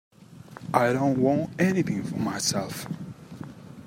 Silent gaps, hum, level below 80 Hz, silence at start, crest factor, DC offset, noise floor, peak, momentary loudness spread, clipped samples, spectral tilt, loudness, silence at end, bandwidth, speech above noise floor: none; none; -62 dBFS; 0.2 s; 22 dB; under 0.1%; -46 dBFS; -6 dBFS; 19 LU; under 0.1%; -5 dB/octave; -26 LUFS; 0 s; 16 kHz; 21 dB